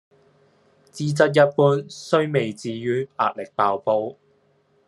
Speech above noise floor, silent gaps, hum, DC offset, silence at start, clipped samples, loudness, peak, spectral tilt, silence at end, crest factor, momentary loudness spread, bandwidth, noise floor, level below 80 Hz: 41 dB; none; none; under 0.1%; 0.95 s; under 0.1%; -21 LUFS; -2 dBFS; -6 dB/octave; 0.75 s; 20 dB; 11 LU; 12 kHz; -62 dBFS; -68 dBFS